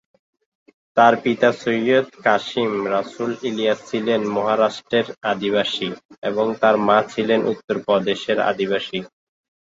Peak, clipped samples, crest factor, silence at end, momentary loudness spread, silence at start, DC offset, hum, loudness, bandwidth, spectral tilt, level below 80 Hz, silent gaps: -2 dBFS; under 0.1%; 18 dB; 0.55 s; 9 LU; 0.95 s; under 0.1%; none; -20 LUFS; 7.8 kHz; -5 dB/octave; -64 dBFS; 6.05-6.09 s, 6.18-6.22 s, 7.64-7.68 s